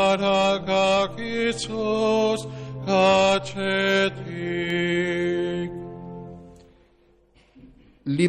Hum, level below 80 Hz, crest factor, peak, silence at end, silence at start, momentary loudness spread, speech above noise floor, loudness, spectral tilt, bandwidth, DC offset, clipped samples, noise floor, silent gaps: none; -52 dBFS; 18 dB; -6 dBFS; 0 s; 0 s; 16 LU; 37 dB; -23 LUFS; -5 dB/octave; 14 kHz; under 0.1%; under 0.1%; -59 dBFS; none